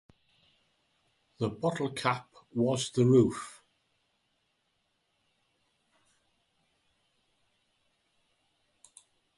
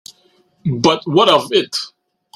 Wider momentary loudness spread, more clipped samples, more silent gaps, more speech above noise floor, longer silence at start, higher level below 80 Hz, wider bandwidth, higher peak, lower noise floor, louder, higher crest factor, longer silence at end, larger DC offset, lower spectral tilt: about the same, 15 LU vs 13 LU; neither; neither; first, 49 dB vs 42 dB; first, 1.4 s vs 0.65 s; second, -68 dBFS vs -56 dBFS; second, 11.5 kHz vs 15 kHz; second, -12 dBFS vs 0 dBFS; first, -77 dBFS vs -56 dBFS; second, -29 LUFS vs -15 LUFS; first, 24 dB vs 16 dB; first, 5.85 s vs 0.5 s; neither; about the same, -6 dB/octave vs -5 dB/octave